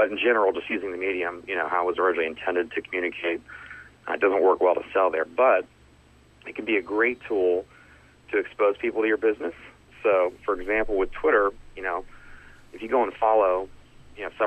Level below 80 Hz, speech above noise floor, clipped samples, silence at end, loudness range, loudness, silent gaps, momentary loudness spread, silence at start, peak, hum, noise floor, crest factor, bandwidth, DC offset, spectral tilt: -52 dBFS; 31 dB; under 0.1%; 0 s; 3 LU; -25 LUFS; none; 13 LU; 0 s; -8 dBFS; none; -55 dBFS; 18 dB; 8.4 kHz; under 0.1%; -6 dB/octave